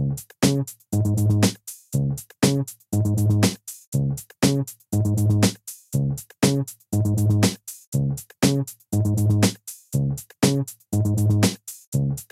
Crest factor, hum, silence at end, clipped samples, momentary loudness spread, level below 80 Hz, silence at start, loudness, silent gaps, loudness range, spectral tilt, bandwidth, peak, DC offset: 20 dB; none; 0.1 s; under 0.1%; 8 LU; -48 dBFS; 0 s; -23 LUFS; 3.87-3.92 s, 7.87-7.92 s, 11.87-11.92 s; 1 LU; -5.5 dB/octave; 16 kHz; -4 dBFS; under 0.1%